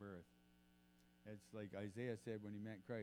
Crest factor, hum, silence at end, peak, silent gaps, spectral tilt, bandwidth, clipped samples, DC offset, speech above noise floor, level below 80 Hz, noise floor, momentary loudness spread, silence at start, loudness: 20 dB; 60 Hz at -75 dBFS; 0 s; -34 dBFS; none; -7 dB/octave; 19 kHz; under 0.1%; under 0.1%; 23 dB; -84 dBFS; -73 dBFS; 12 LU; 0 s; -52 LUFS